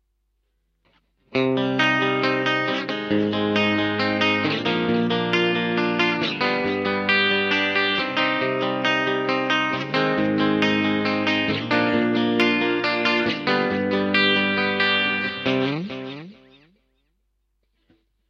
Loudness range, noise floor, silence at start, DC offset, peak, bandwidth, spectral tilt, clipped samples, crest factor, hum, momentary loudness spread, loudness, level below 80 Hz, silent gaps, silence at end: 3 LU; -71 dBFS; 1.3 s; under 0.1%; -4 dBFS; 7.6 kHz; -5.5 dB/octave; under 0.1%; 18 dB; none; 4 LU; -21 LUFS; -62 dBFS; none; 1.95 s